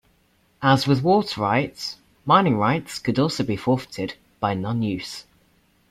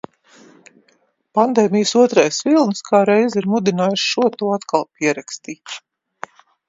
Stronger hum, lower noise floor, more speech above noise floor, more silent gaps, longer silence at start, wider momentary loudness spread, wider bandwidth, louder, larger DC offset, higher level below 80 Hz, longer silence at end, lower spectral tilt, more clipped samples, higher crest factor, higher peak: neither; about the same, -62 dBFS vs -61 dBFS; about the same, 41 dB vs 44 dB; neither; second, 0.6 s vs 1.35 s; second, 14 LU vs 19 LU; first, 15 kHz vs 7.8 kHz; second, -22 LUFS vs -17 LUFS; neither; first, -56 dBFS vs -68 dBFS; second, 0.7 s vs 0.9 s; first, -6 dB/octave vs -4.5 dB/octave; neither; about the same, 20 dB vs 18 dB; about the same, -2 dBFS vs 0 dBFS